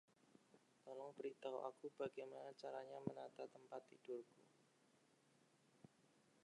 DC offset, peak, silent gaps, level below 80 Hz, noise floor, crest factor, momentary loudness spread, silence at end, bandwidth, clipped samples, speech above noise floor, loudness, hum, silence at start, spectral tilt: under 0.1%; -30 dBFS; none; under -90 dBFS; -78 dBFS; 26 dB; 8 LU; 0.25 s; 11 kHz; under 0.1%; 25 dB; -54 LUFS; none; 0.25 s; -6.5 dB/octave